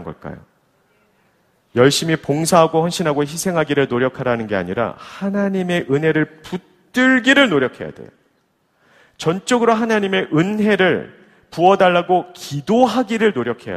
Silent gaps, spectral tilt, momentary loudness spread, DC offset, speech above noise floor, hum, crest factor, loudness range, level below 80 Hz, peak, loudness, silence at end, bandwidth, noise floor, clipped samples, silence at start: none; -5 dB/octave; 13 LU; under 0.1%; 46 dB; none; 18 dB; 3 LU; -56 dBFS; 0 dBFS; -17 LUFS; 0 s; 15.5 kHz; -63 dBFS; under 0.1%; 0 s